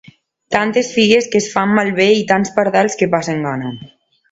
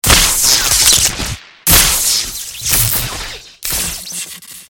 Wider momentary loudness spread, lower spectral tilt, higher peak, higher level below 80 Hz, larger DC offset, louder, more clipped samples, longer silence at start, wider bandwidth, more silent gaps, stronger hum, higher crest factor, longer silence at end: second, 9 LU vs 16 LU; first, -4.5 dB/octave vs -0.5 dB/octave; about the same, 0 dBFS vs 0 dBFS; second, -56 dBFS vs -26 dBFS; neither; second, -15 LUFS vs -11 LUFS; second, under 0.1% vs 0.2%; first, 0.5 s vs 0.05 s; second, 8 kHz vs over 20 kHz; neither; neither; about the same, 16 dB vs 14 dB; first, 0.45 s vs 0.05 s